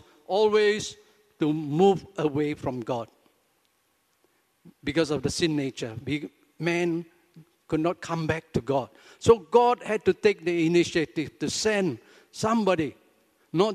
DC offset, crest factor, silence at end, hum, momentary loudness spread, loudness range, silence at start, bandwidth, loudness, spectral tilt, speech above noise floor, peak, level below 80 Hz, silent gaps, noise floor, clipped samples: under 0.1%; 22 dB; 0 s; none; 11 LU; 7 LU; 0.3 s; 13.5 kHz; -26 LUFS; -5.5 dB/octave; 45 dB; -6 dBFS; -58 dBFS; none; -70 dBFS; under 0.1%